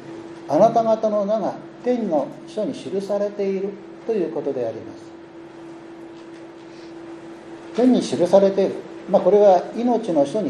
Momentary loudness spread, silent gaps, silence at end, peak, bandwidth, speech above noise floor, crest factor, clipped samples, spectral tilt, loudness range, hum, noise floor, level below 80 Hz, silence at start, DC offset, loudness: 23 LU; none; 0 s; -2 dBFS; 11.5 kHz; 20 dB; 20 dB; under 0.1%; -6.5 dB/octave; 11 LU; none; -40 dBFS; -68 dBFS; 0 s; under 0.1%; -20 LUFS